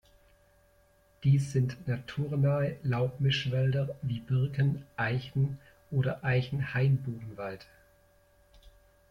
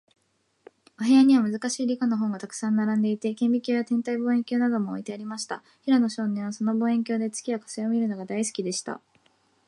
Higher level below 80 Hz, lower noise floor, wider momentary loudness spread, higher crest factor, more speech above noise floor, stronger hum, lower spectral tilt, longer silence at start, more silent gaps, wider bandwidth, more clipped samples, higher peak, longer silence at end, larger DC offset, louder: first, -58 dBFS vs -78 dBFS; second, -65 dBFS vs -71 dBFS; about the same, 10 LU vs 11 LU; about the same, 16 dB vs 16 dB; second, 35 dB vs 46 dB; neither; first, -7.5 dB/octave vs -5 dB/octave; first, 1.2 s vs 1 s; neither; second, 10 kHz vs 11.5 kHz; neither; second, -16 dBFS vs -10 dBFS; second, 0.4 s vs 0.7 s; neither; second, -31 LUFS vs -25 LUFS